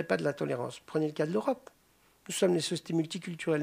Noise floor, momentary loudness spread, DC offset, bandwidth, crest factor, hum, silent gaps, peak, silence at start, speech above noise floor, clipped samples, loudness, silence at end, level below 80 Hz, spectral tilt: -66 dBFS; 8 LU; under 0.1%; 15.5 kHz; 20 dB; none; none; -12 dBFS; 0 s; 35 dB; under 0.1%; -32 LUFS; 0 s; -76 dBFS; -5 dB/octave